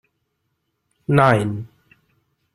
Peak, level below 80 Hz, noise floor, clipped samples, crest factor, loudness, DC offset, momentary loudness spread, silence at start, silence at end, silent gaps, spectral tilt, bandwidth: -2 dBFS; -54 dBFS; -73 dBFS; under 0.1%; 22 dB; -18 LUFS; under 0.1%; 20 LU; 1.1 s; 0.9 s; none; -7.5 dB/octave; 12.5 kHz